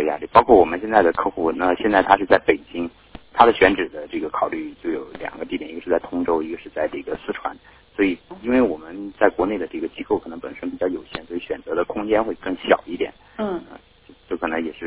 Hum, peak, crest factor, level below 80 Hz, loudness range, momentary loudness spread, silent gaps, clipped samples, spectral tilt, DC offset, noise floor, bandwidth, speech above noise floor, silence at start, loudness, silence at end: none; 0 dBFS; 20 dB; -50 dBFS; 7 LU; 15 LU; none; under 0.1%; -9 dB/octave; under 0.1%; -50 dBFS; 4 kHz; 30 dB; 0 s; -21 LUFS; 0 s